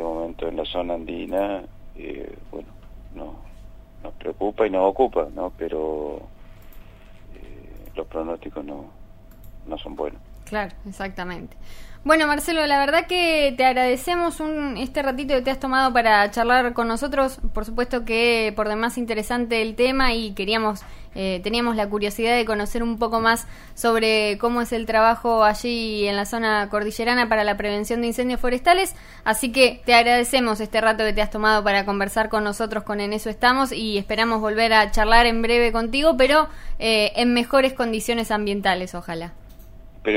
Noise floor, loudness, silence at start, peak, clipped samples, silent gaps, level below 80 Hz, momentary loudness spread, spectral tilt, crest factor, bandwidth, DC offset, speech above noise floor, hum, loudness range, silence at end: -43 dBFS; -21 LUFS; 0 s; -2 dBFS; under 0.1%; none; -36 dBFS; 15 LU; -3.5 dB/octave; 20 dB; 16 kHz; under 0.1%; 21 dB; none; 14 LU; 0 s